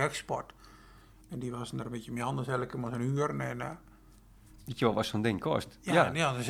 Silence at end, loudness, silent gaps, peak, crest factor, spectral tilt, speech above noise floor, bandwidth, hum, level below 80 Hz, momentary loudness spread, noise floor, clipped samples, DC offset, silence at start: 0 s; -33 LUFS; none; -10 dBFS; 24 dB; -5.5 dB/octave; 25 dB; 16 kHz; none; -60 dBFS; 14 LU; -57 dBFS; under 0.1%; under 0.1%; 0 s